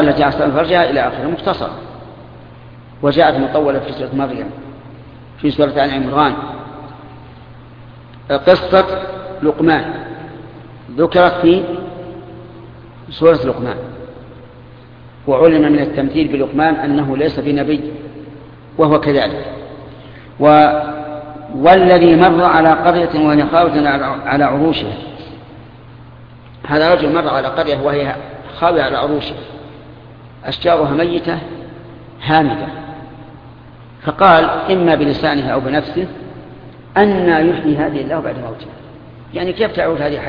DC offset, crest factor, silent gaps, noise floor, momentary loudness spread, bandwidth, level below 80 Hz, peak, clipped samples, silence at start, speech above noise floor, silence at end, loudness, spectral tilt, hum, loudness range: under 0.1%; 16 dB; none; -38 dBFS; 23 LU; 5.2 kHz; -42 dBFS; 0 dBFS; under 0.1%; 0 s; 25 dB; 0 s; -14 LUFS; -9 dB/octave; none; 8 LU